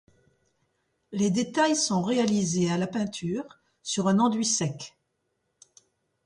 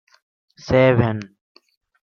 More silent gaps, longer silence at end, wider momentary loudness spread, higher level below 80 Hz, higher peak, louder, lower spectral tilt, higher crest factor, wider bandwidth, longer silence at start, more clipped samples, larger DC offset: neither; first, 1.35 s vs 0.85 s; second, 14 LU vs 25 LU; second, -68 dBFS vs -48 dBFS; second, -12 dBFS vs -2 dBFS; second, -26 LUFS vs -18 LUFS; second, -4.5 dB/octave vs -8 dB/octave; about the same, 16 dB vs 20 dB; first, 11.5 kHz vs 7 kHz; first, 1.1 s vs 0.65 s; neither; neither